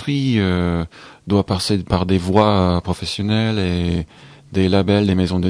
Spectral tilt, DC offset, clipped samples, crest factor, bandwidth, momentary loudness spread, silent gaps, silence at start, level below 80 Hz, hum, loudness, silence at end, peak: -6.5 dB/octave; under 0.1%; under 0.1%; 18 dB; 11 kHz; 10 LU; none; 0 s; -38 dBFS; none; -18 LUFS; 0 s; 0 dBFS